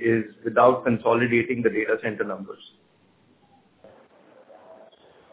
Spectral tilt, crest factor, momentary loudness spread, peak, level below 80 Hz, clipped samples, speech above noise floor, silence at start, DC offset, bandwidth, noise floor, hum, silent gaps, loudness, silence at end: -10.5 dB/octave; 22 dB; 14 LU; -4 dBFS; -64 dBFS; under 0.1%; 38 dB; 0 s; under 0.1%; 4 kHz; -60 dBFS; none; none; -23 LUFS; 0.6 s